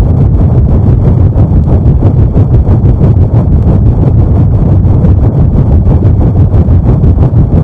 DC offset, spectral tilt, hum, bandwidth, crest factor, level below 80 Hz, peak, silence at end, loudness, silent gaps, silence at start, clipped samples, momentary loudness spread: under 0.1%; -12 dB/octave; none; 3.3 kHz; 4 dB; -10 dBFS; 0 dBFS; 0 s; -7 LUFS; none; 0 s; 6%; 1 LU